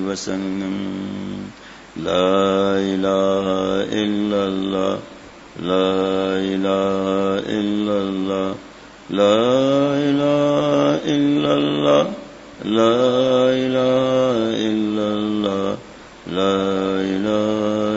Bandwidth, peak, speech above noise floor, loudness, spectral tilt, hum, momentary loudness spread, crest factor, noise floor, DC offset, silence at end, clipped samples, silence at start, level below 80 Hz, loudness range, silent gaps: 8 kHz; -2 dBFS; 21 dB; -19 LUFS; -6 dB/octave; none; 12 LU; 16 dB; -39 dBFS; under 0.1%; 0 s; under 0.1%; 0 s; -54 dBFS; 3 LU; none